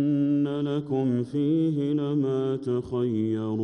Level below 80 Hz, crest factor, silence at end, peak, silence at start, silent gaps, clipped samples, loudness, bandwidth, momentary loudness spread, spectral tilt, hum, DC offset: -62 dBFS; 10 dB; 0 s; -16 dBFS; 0 s; none; under 0.1%; -26 LUFS; 6.6 kHz; 4 LU; -9.5 dB/octave; none; under 0.1%